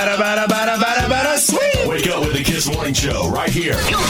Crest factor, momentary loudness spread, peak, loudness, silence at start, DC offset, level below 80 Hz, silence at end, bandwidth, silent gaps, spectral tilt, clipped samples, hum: 14 dB; 4 LU; -2 dBFS; -17 LUFS; 0 s; 0.1%; -32 dBFS; 0 s; 17.5 kHz; none; -3.5 dB/octave; under 0.1%; none